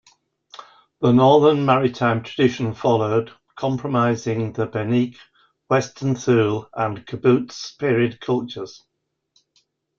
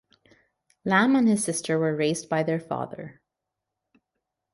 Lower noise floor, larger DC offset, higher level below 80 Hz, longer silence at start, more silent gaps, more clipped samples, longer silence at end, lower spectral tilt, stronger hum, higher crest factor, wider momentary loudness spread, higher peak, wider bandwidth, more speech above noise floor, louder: second, -67 dBFS vs -85 dBFS; neither; first, -58 dBFS vs -70 dBFS; second, 0.6 s vs 0.85 s; neither; neither; second, 1.25 s vs 1.4 s; first, -7 dB/octave vs -5 dB/octave; neither; about the same, 18 dB vs 20 dB; second, 10 LU vs 15 LU; first, -2 dBFS vs -8 dBFS; second, 7.4 kHz vs 11.5 kHz; second, 48 dB vs 61 dB; first, -20 LUFS vs -24 LUFS